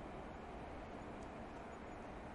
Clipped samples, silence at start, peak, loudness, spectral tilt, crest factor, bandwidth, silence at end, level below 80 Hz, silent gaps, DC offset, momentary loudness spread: under 0.1%; 0 s; -38 dBFS; -51 LUFS; -6.5 dB/octave; 12 dB; 11 kHz; 0 s; -60 dBFS; none; under 0.1%; 1 LU